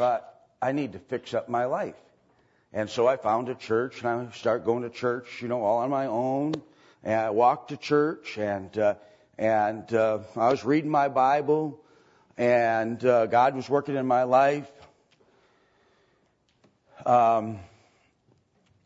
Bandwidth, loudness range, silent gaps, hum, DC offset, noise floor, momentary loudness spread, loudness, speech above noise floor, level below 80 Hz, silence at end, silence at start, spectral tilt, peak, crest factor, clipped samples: 8 kHz; 5 LU; none; none; under 0.1%; -68 dBFS; 11 LU; -26 LUFS; 43 dB; -72 dBFS; 1.2 s; 0 s; -6.5 dB/octave; -8 dBFS; 18 dB; under 0.1%